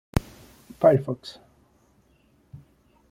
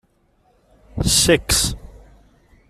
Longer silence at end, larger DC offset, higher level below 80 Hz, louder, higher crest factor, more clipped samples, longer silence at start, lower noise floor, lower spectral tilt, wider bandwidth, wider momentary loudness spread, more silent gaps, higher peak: first, 1.8 s vs 0.7 s; neither; second, -44 dBFS vs -34 dBFS; second, -24 LUFS vs -16 LUFS; about the same, 24 dB vs 20 dB; neither; second, 0.15 s vs 0.95 s; about the same, -62 dBFS vs -60 dBFS; first, -7.5 dB/octave vs -2.5 dB/octave; about the same, 16 kHz vs 15.5 kHz; second, 16 LU vs 20 LU; neither; about the same, -4 dBFS vs -2 dBFS